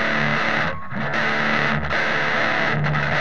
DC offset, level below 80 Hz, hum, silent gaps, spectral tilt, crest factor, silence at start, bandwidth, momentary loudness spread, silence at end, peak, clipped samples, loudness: 4%; -44 dBFS; none; none; -5.5 dB/octave; 18 dB; 0 s; 9.4 kHz; 4 LU; 0 s; -4 dBFS; under 0.1%; -20 LUFS